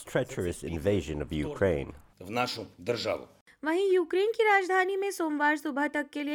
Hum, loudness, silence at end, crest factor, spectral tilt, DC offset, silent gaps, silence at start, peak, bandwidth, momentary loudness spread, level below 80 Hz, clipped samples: none; -29 LUFS; 0 s; 16 dB; -5 dB/octave; under 0.1%; 3.41-3.46 s; 0 s; -12 dBFS; 17.5 kHz; 10 LU; -52 dBFS; under 0.1%